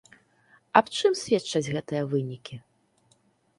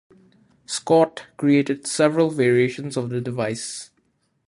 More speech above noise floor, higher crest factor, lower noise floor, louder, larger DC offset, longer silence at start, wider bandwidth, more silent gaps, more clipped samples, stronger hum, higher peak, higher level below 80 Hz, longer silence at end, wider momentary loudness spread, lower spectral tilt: second, 40 dB vs 47 dB; first, 28 dB vs 18 dB; about the same, -66 dBFS vs -67 dBFS; second, -26 LUFS vs -21 LUFS; neither; about the same, 0.75 s vs 0.7 s; about the same, 11.5 kHz vs 11.5 kHz; neither; neither; neither; first, 0 dBFS vs -4 dBFS; about the same, -66 dBFS vs -66 dBFS; first, 1 s vs 0.65 s; first, 18 LU vs 11 LU; about the same, -5 dB/octave vs -5 dB/octave